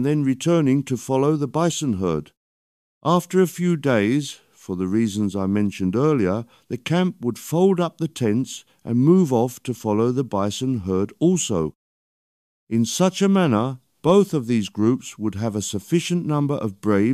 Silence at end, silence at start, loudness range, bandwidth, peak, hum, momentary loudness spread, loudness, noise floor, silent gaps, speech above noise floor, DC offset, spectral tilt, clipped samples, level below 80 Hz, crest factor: 0 s; 0 s; 2 LU; 14.5 kHz; -4 dBFS; none; 9 LU; -21 LUFS; under -90 dBFS; 2.37-3.01 s, 11.75-12.67 s; over 70 dB; under 0.1%; -6 dB/octave; under 0.1%; -58 dBFS; 16 dB